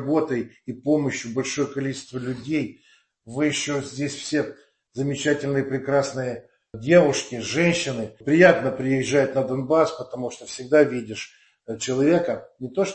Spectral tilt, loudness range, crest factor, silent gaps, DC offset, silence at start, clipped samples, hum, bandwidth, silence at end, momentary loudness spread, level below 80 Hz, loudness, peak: -5 dB/octave; 7 LU; 22 dB; none; under 0.1%; 0 s; under 0.1%; none; 8.8 kHz; 0 s; 15 LU; -60 dBFS; -23 LUFS; -2 dBFS